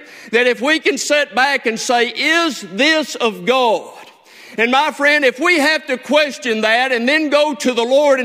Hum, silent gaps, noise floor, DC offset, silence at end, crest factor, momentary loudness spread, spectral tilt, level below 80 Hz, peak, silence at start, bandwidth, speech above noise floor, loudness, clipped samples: none; none; -41 dBFS; under 0.1%; 0 s; 16 dB; 5 LU; -2 dB/octave; -66 dBFS; 0 dBFS; 0 s; 16 kHz; 25 dB; -15 LUFS; under 0.1%